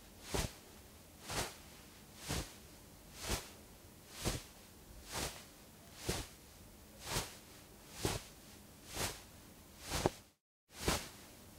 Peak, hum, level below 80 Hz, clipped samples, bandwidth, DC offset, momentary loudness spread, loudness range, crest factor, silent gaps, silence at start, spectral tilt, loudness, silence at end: -12 dBFS; none; -54 dBFS; under 0.1%; 16 kHz; under 0.1%; 18 LU; 3 LU; 32 dB; 10.41-10.67 s; 0 s; -3 dB/octave; -43 LUFS; 0 s